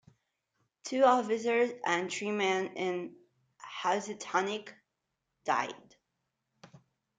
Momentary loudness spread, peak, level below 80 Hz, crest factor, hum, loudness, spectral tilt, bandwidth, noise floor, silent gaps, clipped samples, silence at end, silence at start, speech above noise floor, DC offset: 19 LU; -12 dBFS; -84 dBFS; 22 dB; none; -31 LUFS; -3.5 dB/octave; 9.6 kHz; -85 dBFS; none; under 0.1%; 0.4 s; 0.85 s; 54 dB; under 0.1%